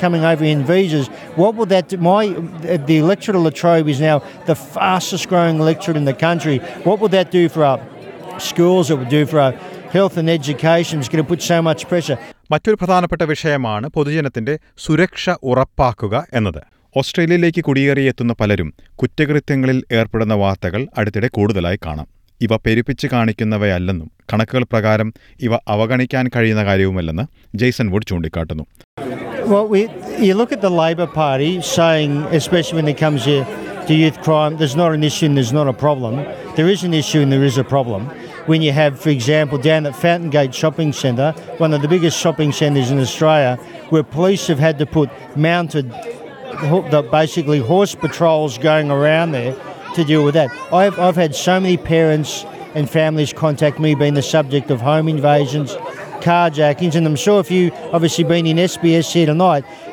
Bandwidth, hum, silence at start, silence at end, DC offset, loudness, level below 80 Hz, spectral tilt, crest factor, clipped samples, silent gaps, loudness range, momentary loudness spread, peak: 16 kHz; none; 0 s; 0 s; under 0.1%; -16 LUFS; -44 dBFS; -6 dB/octave; 14 dB; under 0.1%; 28.84-28.97 s; 3 LU; 9 LU; -2 dBFS